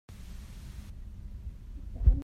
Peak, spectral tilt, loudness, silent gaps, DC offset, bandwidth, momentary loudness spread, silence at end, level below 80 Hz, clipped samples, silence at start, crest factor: -10 dBFS; -8 dB/octave; -38 LUFS; none; under 0.1%; 7.2 kHz; 18 LU; 0 s; -32 dBFS; under 0.1%; 0.1 s; 22 dB